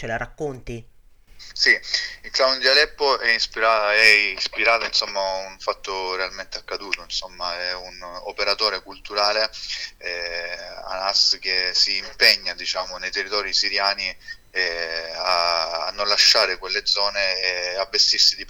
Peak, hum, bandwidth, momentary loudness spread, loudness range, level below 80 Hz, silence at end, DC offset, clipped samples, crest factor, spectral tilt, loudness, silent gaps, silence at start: -2 dBFS; none; over 20 kHz; 15 LU; 7 LU; -48 dBFS; 0 s; under 0.1%; under 0.1%; 20 dB; -0.5 dB/octave; -20 LUFS; none; 0 s